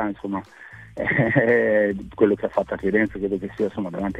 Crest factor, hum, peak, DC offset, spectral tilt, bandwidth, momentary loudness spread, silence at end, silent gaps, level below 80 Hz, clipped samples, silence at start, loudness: 18 dB; none; -4 dBFS; under 0.1%; -8.5 dB/octave; 9.2 kHz; 13 LU; 0 s; none; -50 dBFS; under 0.1%; 0 s; -22 LUFS